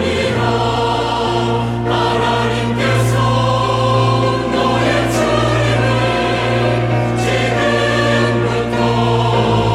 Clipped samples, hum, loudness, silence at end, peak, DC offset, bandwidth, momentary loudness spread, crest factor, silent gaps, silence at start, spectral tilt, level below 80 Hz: under 0.1%; none; -15 LUFS; 0 s; -2 dBFS; under 0.1%; 13 kHz; 2 LU; 12 dB; none; 0 s; -6 dB/octave; -34 dBFS